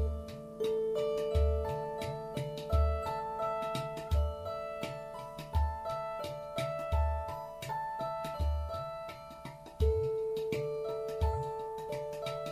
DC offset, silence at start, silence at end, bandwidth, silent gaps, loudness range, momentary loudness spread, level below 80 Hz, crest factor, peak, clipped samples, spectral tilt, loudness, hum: under 0.1%; 0 s; 0 s; 14 kHz; none; 3 LU; 10 LU; -38 dBFS; 16 dB; -18 dBFS; under 0.1%; -6.5 dB/octave; -36 LUFS; none